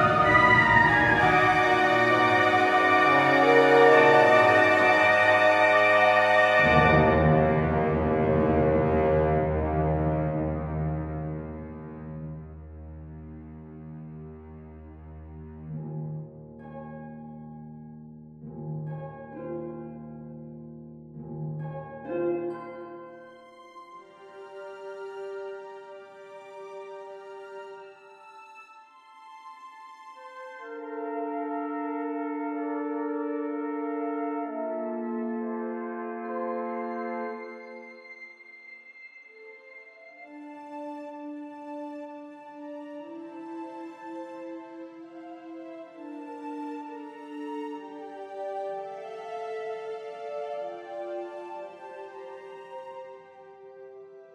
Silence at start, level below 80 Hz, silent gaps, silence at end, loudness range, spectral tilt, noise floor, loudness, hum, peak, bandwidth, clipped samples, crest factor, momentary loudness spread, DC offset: 0 s; -46 dBFS; none; 0.1 s; 23 LU; -6.5 dB/octave; -52 dBFS; -23 LUFS; none; -6 dBFS; 13 kHz; under 0.1%; 22 dB; 26 LU; under 0.1%